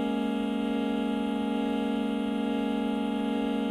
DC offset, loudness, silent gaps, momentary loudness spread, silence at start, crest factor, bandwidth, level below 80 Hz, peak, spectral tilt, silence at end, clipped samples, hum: under 0.1%; -29 LUFS; none; 1 LU; 0 s; 10 dB; 12.5 kHz; -58 dBFS; -18 dBFS; -6.5 dB/octave; 0 s; under 0.1%; none